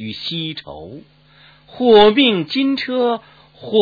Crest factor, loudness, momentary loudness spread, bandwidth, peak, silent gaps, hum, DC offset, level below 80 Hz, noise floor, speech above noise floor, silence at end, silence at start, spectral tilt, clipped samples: 16 dB; -15 LUFS; 24 LU; 4.9 kHz; 0 dBFS; none; none; under 0.1%; -50 dBFS; -49 dBFS; 33 dB; 0 s; 0 s; -7 dB/octave; under 0.1%